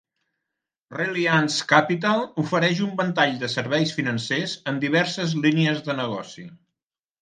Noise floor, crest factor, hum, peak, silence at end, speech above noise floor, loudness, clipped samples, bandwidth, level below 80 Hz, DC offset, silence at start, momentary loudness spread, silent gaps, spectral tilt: -89 dBFS; 22 dB; none; 0 dBFS; 0.65 s; 66 dB; -22 LUFS; under 0.1%; 9.8 kHz; -68 dBFS; under 0.1%; 0.9 s; 9 LU; none; -5 dB/octave